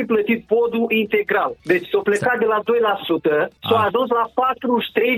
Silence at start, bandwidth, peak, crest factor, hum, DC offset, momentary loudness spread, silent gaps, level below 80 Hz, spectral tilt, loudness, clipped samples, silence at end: 0 s; 15.5 kHz; -2 dBFS; 16 dB; none; under 0.1%; 2 LU; none; -60 dBFS; -5.5 dB/octave; -19 LUFS; under 0.1%; 0 s